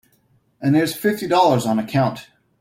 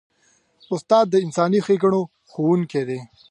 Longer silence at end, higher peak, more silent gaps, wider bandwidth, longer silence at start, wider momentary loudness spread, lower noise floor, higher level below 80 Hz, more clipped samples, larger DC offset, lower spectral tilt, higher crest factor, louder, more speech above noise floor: about the same, 0.35 s vs 0.25 s; about the same, -4 dBFS vs -4 dBFS; neither; first, 16.5 kHz vs 10.5 kHz; about the same, 0.6 s vs 0.7 s; second, 8 LU vs 12 LU; about the same, -61 dBFS vs -62 dBFS; first, -58 dBFS vs -68 dBFS; neither; neither; about the same, -6 dB/octave vs -7 dB/octave; about the same, 16 dB vs 18 dB; about the same, -19 LUFS vs -20 LUFS; about the same, 43 dB vs 42 dB